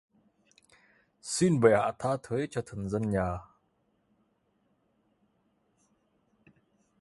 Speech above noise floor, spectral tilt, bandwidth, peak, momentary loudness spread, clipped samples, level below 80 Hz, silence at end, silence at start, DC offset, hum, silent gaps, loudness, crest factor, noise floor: 45 dB; -6 dB/octave; 11.5 kHz; -8 dBFS; 12 LU; under 0.1%; -56 dBFS; 3.6 s; 1.25 s; under 0.1%; none; none; -29 LUFS; 26 dB; -73 dBFS